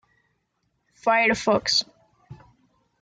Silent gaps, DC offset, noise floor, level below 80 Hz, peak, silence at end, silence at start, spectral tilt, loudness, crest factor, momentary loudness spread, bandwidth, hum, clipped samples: none; under 0.1%; -73 dBFS; -60 dBFS; -8 dBFS; 0.65 s; 1.05 s; -2.5 dB/octave; -21 LUFS; 18 dB; 8 LU; 9.6 kHz; none; under 0.1%